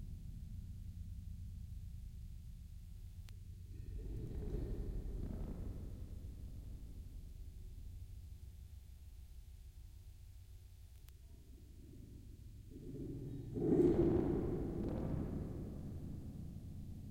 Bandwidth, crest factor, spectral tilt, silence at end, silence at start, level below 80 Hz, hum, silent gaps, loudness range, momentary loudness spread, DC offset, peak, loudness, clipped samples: 16.5 kHz; 22 dB; -9 dB/octave; 0 s; 0 s; -50 dBFS; none; none; 20 LU; 19 LU; under 0.1%; -22 dBFS; -44 LUFS; under 0.1%